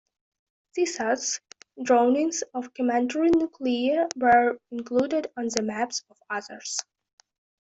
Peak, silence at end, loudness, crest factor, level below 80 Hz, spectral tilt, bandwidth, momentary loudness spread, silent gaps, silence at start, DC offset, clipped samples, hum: -4 dBFS; 0.85 s; -25 LUFS; 22 dB; -66 dBFS; -3 dB/octave; 8.2 kHz; 13 LU; none; 0.75 s; under 0.1%; under 0.1%; none